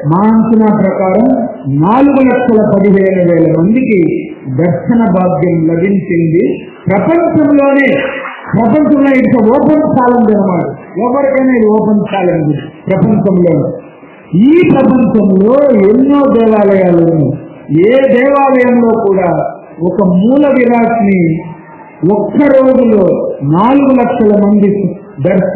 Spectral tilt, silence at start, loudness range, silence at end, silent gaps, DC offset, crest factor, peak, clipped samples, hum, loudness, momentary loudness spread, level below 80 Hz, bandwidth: -12 dB/octave; 0 s; 3 LU; 0 s; none; under 0.1%; 8 dB; 0 dBFS; 1%; none; -9 LUFS; 8 LU; -42 dBFS; 4 kHz